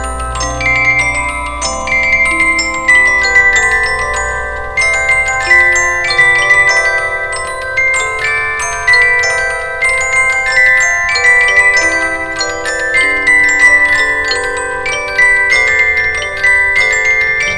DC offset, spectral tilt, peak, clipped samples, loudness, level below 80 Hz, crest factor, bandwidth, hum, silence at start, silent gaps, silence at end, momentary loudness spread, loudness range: under 0.1%; -1.5 dB/octave; 0 dBFS; under 0.1%; -9 LUFS; -30 dBFS; 12 dB; 11 kHz; none; 0 s; none; 0 s; 9 LU; 2 LU